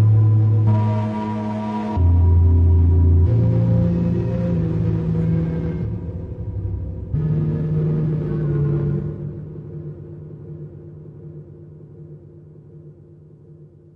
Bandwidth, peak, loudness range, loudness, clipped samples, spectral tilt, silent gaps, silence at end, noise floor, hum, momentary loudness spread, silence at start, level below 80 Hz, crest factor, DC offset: 3.8 kHz; -6 dBFS; 20 LU; -19 LUFS; under 0.1%; -11.5 dB/octave; none; 0.3 s; -44 dBFS; none; 23 LU; 0 s; -34 dBFS; 12 dB; under 0.1%